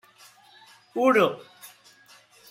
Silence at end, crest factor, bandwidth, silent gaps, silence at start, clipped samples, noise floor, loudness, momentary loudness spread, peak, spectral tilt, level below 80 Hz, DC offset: 0.85 s; 20 dB; 16 kHz; none; 0.95 s; under 0.1%; -55 dBFS; -23 LUFS; 27 LU; -8 dBFS; -5 dB/octave; -78 dBFS; under 0.1%